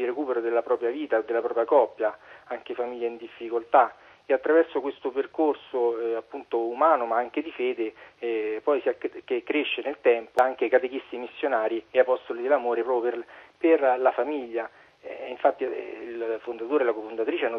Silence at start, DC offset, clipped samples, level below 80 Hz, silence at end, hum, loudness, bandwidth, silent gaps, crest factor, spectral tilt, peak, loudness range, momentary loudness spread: 0 s; under 0.1%; under 0.1%; -74 dBFS; 0 s; none; -26 LUFS; 5.8 kHz; none; 20 dB; -5 dB/octave; -6 dBFS; 2 LU; 12 LU